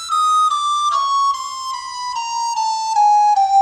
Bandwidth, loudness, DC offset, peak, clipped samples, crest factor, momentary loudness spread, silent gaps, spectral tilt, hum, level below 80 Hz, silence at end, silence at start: 13 kHz; -17 LUFS; under 0.1%; -6 dBFS; under 0.1%; 10 dB; 11 LU; none; 2.5 dB/octave; none; -62 dBFS; 0 s; 0 s